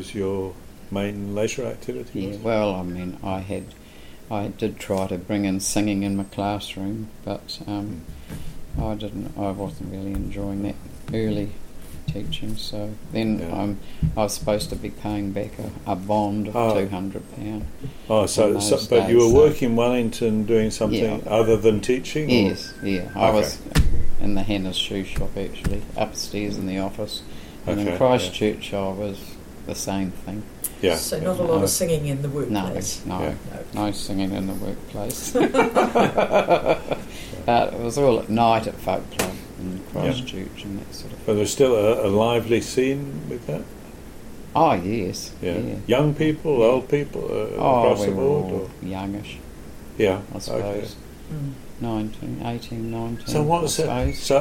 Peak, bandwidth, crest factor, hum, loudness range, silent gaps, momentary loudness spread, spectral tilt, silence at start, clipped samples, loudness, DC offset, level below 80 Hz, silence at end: -4 dBFS; 16.5 kHz; 18 dB; none; 9 LU; none; 14 LU; -5.5 dB/octave; 0 s; under 0.1%; -23 LUFS; under 0.1%; -36 dBFS; 0 s